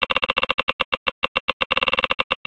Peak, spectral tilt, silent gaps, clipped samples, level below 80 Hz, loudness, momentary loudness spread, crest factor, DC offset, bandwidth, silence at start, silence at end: -2 dBFS; -3.5 dB/octave; 0.54-0.67 s, 0.73-0.79 s, 0.85-1.06 s, 1.12-1.22 s, 1.28-1.60 s, 1.66-1.70 s, 2.24-2.30 s; under 0.1%; -50 dBFS; -21 LUFS; 4 LU; 20 dB; 0.1%; 9.8 kHz; 0 s; 0.1 s